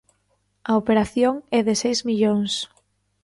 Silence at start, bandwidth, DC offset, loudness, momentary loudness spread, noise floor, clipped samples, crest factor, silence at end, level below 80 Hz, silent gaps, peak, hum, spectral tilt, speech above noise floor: 0.65 s; 11.5 kHz; under 0.1%; -21 LUFS; 8 LU; -68 dBFS; under 0.1%; 14 dB; 0.6 s; -54 dBFS; none; -8 dBFS; 50 Hz at -45 dBFS; -4.5 dB/octave; 48 dB